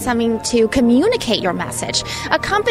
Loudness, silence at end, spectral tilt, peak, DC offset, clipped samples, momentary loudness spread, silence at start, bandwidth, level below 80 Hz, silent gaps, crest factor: -17 LUFS; 0 s; -4 dB/octave; 0 dBFS; under 0.1%; under 0.1%; 6 LU; 0 s; 15.5 kHz; -40 dBFS; none; 16 dB